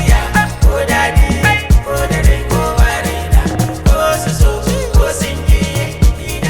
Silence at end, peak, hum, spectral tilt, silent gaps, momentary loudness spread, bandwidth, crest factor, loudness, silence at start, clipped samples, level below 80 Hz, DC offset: 0 s; 0 dBFS; none; -5 dB/octave; none; 4 LU; 19.5 kHz; 10 dB; -13 LUFS; 0 s; under 0.1%; -14 dBFS; under 0.1%